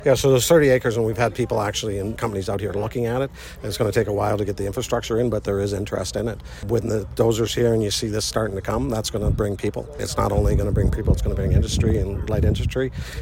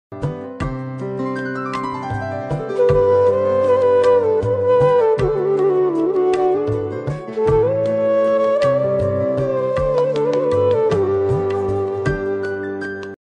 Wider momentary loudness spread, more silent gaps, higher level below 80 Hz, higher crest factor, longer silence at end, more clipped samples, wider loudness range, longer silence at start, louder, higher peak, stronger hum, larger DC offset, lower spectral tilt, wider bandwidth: second, 8 LU vs 11 LU; neither; first, -30 dBFS vs -40 dBFS; first, 18 dB vs 12 dB; about the same, 0 s vs 0.1 s; neither; about the same, 3 LU vs 4 LU; about the same, 0 s vs 0.1 s; second, -22 LUFS vs -18 LUFS; about the same, -4 dBFS vs -4 dBFS; neither; neither; second, -5.5 dB/octave vs -8 dB/octave; first, 16.5 kHz vs 9.6 kHz